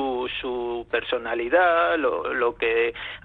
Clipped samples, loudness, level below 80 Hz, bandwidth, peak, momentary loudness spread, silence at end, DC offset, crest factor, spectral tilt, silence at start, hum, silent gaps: under 0.1%; -23 LUFS; -52 dBFS; 4.7 kHz; -8 dBFS; 9 LU; 0.05 s; under 0.1%; 16 dB; -7 dB/octave; 0 s; none; none